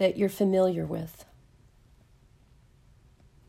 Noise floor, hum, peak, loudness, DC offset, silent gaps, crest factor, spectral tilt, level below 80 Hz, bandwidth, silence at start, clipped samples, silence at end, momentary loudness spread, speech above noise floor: -59 dBFS; none; -12 dBFS; -27 LUFS; under 0.1%; none; 18 dB; -7 dB/octave; -60 dBFS; 16 kHz; 0 s; under 0.1%; 2.25 s; 18 LU; 33 dB